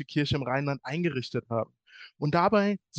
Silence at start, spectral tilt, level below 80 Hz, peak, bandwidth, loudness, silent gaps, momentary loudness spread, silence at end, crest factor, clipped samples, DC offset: 0 s; -7 dB/octave; -58 dBFS; -10 dBFS; 8.4 kHz; -28 LUFS; none; 10 LU; 0 s; 18 dB; under 0.1%; under 0.1%